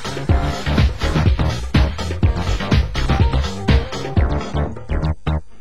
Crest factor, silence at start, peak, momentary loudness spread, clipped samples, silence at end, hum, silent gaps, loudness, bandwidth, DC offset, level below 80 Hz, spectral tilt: 16 dB; 0 s; -2 dBFS; 6 LU; under 0.1%; 0.2 s; none; none; -19 LUFS; 12 kHz; 3%; -20 dBFS; -6.5 dB/octave